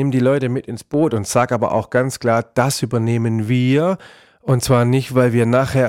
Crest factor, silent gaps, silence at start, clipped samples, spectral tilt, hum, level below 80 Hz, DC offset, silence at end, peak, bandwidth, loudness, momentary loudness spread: 14 dB; none; 0 s; under 0.1%; -6.5 dB/octave; none; -48 dBFS; 0.1%; 0 s; -4 dBFS; 16 kHz; -17 LUFS; 6 LU